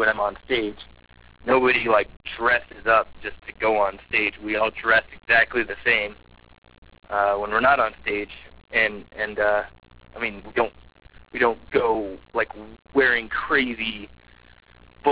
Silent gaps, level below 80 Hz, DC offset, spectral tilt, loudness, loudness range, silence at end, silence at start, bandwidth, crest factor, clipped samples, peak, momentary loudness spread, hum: 6.58-6.62 s, 6.78-6.82 s; -50 dBFS; 0.2%; -7.5 dB/octave; -22 LUFS; 4 LU; 0 s; 0 s; 4 kHz; 18 dB; under 0.1%; -6 dBFS; 13 LU; none